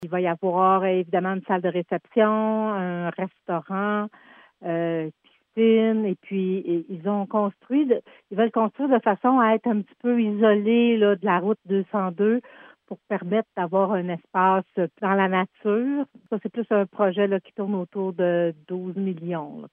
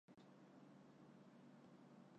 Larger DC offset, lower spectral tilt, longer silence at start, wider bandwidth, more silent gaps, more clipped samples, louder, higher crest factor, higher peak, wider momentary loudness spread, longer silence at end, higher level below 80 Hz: neither; first, -10 dB/octave vs -6.5 dB/octave; about the same, 0 s vs 0.1 s; second, 3.7 kHz vs 8.4 kHz; neither; neither; first, -24 LUFS vs -66 LUFS; first, 18 dB vs 12 dB; first, -6 dBFS vs -54 dBFS; first, 10 LU vs 1 LU; about the same, 0.05 s vs 0 s; first, -82 dBFS vs under -90 dBFS